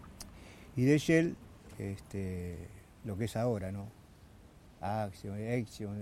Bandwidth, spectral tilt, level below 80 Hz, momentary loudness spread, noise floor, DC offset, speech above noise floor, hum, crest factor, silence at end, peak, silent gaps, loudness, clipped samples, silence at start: 16 kHz; -6.5 dB/octave; -60 dBFS; 21 LU; -57 dBFS; under 0.1%; 23 dB; none; 22 dB; 0 s; -14 dBFS; none; -35 LUFS; under 0.1%; 0 s